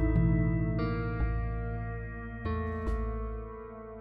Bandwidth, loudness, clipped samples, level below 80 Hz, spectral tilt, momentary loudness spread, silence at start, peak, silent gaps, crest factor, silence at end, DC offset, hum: 5 kHz; -33 LUFS; under 0.1%; -36 dBFS; -10.5 dB/octave; 13 LU; 0 s; -16 dBFS; none; 16 dB; 0 s; under 0.1%; none